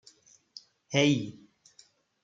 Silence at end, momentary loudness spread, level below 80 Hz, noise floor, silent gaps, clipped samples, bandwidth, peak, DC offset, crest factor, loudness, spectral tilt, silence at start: 0.9 s; 25 LU; -74 dBFS; -62 dBFS; none; under 0.1%; 7.8 kHz; -10 dBFS; under 0.1%; 24 dB; -27 LUFS; -5 dB/octave; 0.9 s